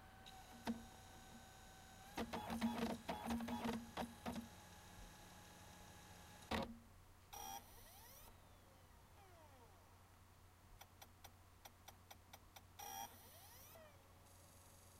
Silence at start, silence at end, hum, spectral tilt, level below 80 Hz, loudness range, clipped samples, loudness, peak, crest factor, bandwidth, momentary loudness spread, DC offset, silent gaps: 0 s; 0 s; none; -4.5 dB/octave; -68 dBFS; 17 LU; under 0.1%; -52 LUFS; -30 dBFS; 24 dB; 16 kHz; 20 LU; under 0.1%; none